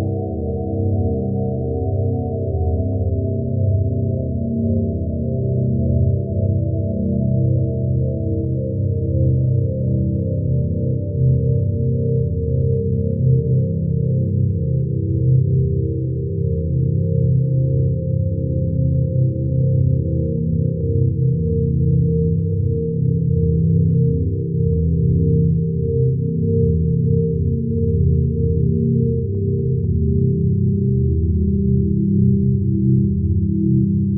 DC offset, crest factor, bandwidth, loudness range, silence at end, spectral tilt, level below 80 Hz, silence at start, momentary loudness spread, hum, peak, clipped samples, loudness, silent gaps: under 0.1%; 12 dB; 0.8 kHz; 2 LU; 0 s; -12.5 dB/octave; -30 dBFS; 0 s; 5 LU; none; -6 dBFS; under 0.1%; -19 LUFS; none